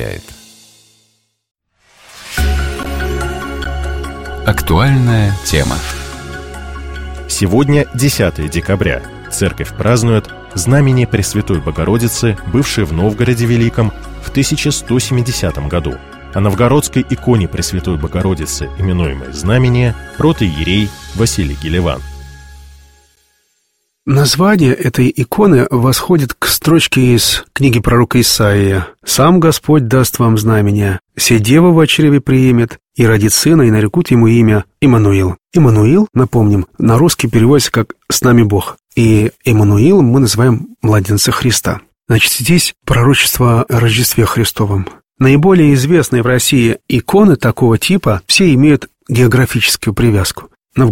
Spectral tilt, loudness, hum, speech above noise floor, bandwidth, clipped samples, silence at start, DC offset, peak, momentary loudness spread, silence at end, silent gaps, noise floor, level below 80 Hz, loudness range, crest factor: -5.5 dB/octave; -11 LUFS; none; 54 dB; 16.5 kHz; under 0.1%; 0 s; under 0.1%; 0 dBFS; 11 LU; 0 s; none; -64 dBFS; -28 dBFS; 5 LU; 12 dB